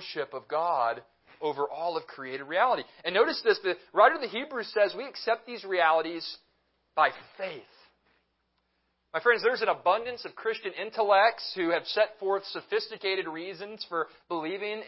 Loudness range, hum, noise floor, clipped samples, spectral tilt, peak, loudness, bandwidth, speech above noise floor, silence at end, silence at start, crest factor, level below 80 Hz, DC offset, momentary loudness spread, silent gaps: 4 LU; none; -76 dBFS; under 0.1%; -7 dB/octave; -6 dBFS; -28 LUFS; 5.8 kHz; 47 dB; 0 s; 0 s; 22 dB; -80 dBFS; under 0.1%; 14 LU; none